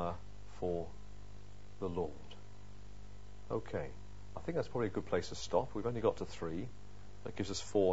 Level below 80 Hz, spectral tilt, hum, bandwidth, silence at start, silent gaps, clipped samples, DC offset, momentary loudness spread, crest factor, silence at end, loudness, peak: -56 dBFS; -5.5 dB/octave; 50 Hz at -55 dBFS; 7.6 kHz; 0 s; none; under 0.1%; 0.6%; 20 LU; 22 dB; 0 s; -40 LUFS; -18 dBFS